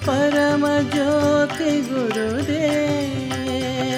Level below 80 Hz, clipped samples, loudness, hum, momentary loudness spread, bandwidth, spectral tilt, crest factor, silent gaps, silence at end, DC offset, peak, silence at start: -50 dBFS; under 0.1%; -20 LUFS; none; 6 LU; 16 kHz; -5.5 dB/octave; 12 dB; none; 0 s; under 0.1%; -6 dBFS; 0 s